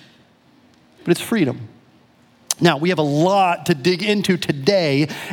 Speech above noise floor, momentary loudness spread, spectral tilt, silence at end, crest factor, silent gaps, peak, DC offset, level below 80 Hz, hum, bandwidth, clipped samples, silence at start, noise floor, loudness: 36 dB; 6 LU; -5 dB/octave; 0 s; 20 dB; none; 0 dBFS; under 0.1%; -64 dBFS; none; 18.5 kHz; under 0.1%; 1.05 s; -53 dBFS; -18 LUFS